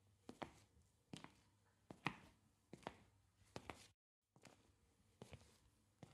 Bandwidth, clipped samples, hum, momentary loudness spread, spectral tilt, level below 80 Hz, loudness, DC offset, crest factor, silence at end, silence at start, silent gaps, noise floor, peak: 13 kHz; under 0.1%; none; 18 LU; -4.5 dB/octave; -80 dBFS; -57 LUFS; under 0.1%; 38 dB; 0 s; 0 s; 3.94-4.22 s; -78 dBFS; -24 dBFS